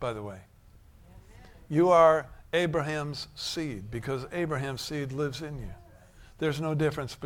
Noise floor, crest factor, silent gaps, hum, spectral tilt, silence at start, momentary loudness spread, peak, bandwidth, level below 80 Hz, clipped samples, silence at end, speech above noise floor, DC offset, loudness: -55 dBFS; 22 dB; none; none; -6 dB/octave; 0 s; 17 LU; -8 dBFS; 17 kHz; -52 dBFS; under 0.1%; 0 s; 27 dB; under 0.1%; -29 LUFS